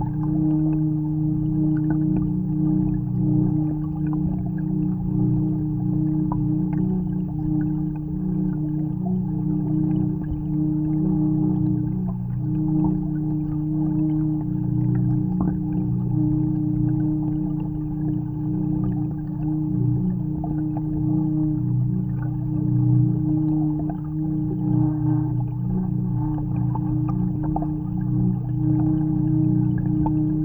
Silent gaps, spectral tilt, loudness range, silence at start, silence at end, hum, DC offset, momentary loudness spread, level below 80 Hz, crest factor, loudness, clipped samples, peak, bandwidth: none; -13.5 dB/octave; 2 LU; 0 s; 0 s; none; under 0.1%; 5 LU; -38 dBFS; 14 dB; -23 LUFS; under 0.1%; -8 dBFS; 1.9 kHz